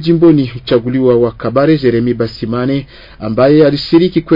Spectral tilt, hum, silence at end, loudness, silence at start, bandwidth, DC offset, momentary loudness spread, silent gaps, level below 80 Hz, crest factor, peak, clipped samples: -9 dB/octave; none; 0 s; -12 LUFS; 0 s; 5.4 kHz; under 0.1%; 9 LU; none; -40 dBFS; 10 dB; 0 dBFS; under 0.1%